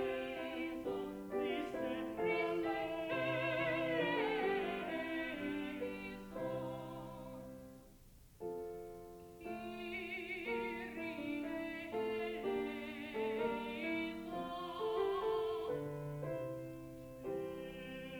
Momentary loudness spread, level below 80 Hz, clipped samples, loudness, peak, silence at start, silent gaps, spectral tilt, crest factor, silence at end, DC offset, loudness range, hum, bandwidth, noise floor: 13 LU; -66 dBFS; under 0.1%; -41 LUFS; -24 dBFS; 0 s; none; -6 dB/octave; 16 dB; 0 s; under 0.1%; 10 LU; none; over 20 kHz; -61 dBFS